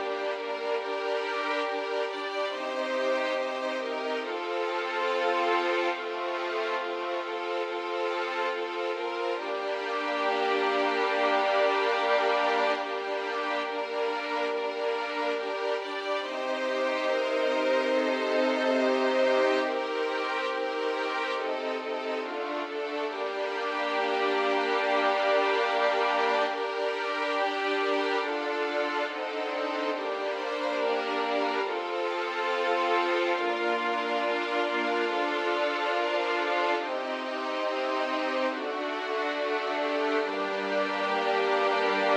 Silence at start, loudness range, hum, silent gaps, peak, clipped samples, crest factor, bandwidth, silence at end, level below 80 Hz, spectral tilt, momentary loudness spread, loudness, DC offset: 0 s; 4 LU; none; none; -14 dBFS; under 0.1%; 16 dB; 11 kHz; 0 s; under -90 dBFS; -2.5 dB/octave; 6 LU; -28 LUFS; under 0.1%